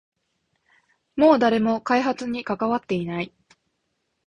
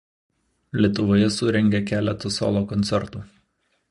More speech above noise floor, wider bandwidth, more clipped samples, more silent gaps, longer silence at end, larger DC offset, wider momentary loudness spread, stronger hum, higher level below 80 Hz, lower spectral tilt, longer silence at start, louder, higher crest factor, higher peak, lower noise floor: first, 54 dB vs 48 dB; about the same, 10 kHz vs 11 kHz; neither; neither; first, 1 s vs 0.65 s; neither; first, 13 LU vs 9 LU; neither; second, -60 dBFS vs -48 dBFS; about the same, -6.5 dB/octave vs -6 dB/octave; first, 1.15 s vs 0.75 s; about the same, -22 LUFS vs -22 LUFS; about the same, 18 dB vs 18 dB; about the same, -6 dBFS vs -6 dBFS; first, -75 dBFS vs -69 dBFS